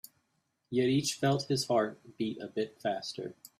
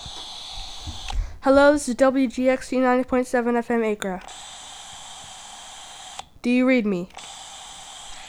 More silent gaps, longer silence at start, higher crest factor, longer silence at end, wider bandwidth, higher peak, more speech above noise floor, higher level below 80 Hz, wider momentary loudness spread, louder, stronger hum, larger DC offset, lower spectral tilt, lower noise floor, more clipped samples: neither; first, 0.7 s vs 0 s; about the same, 16 dB vs 20 dB; first, 0.3 s vs 0 s; first, 15 kHz vs 13.5 kHz; second, -16 dBFS vs -4 dBFS; first, 46 dB vs 20 dB; second, -72 dBFS vs -40 dBFS; second, 9 LU vs 19 LU; second, -32 LUFS vs -21 LUFS; neither; neither; about the same, -5 dB/octave vs -4.5 dB/octave; first, -78 dBFS vs -40 dBFS; neither